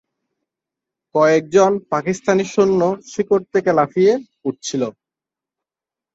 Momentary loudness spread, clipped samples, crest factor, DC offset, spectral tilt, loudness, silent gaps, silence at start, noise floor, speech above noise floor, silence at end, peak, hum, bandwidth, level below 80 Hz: 9 LU; under 0.1%; 16 dB; under 0.1%; -5.5 dB/octave; -18 LUFS; none; 1.15 s; -89 dBFS; 72 dB; 1.25 s; -2 dBFS; none; 8 kHz; -60 dBFS